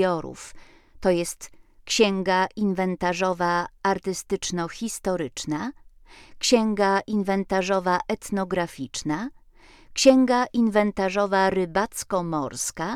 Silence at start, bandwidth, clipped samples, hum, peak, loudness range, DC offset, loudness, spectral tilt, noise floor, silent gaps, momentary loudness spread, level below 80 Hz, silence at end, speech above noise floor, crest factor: 0 s; 15 kHz; under 0.1%; none; -4 dBFS; 4 LU; under 0.1%; -24 LUFS; -4 dB/octave; -52 dBFS; none; 10 LU; -52 dBFS; 0 s; 28 dB; 20 dB